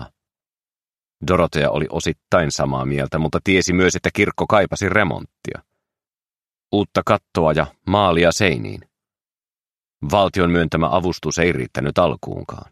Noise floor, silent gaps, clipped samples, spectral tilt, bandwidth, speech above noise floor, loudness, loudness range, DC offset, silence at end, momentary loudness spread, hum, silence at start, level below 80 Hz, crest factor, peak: under -90 dBFS; 9.60-9.64 s; under 0.1%; -5 dB/octave; 14 kHz; over 72 dB; -18 LUFS; 3 LU; under 0.1%; 0.15 s; 13 LU; none; 0 s; -42 dBFS; 20 dB; 0 dBFS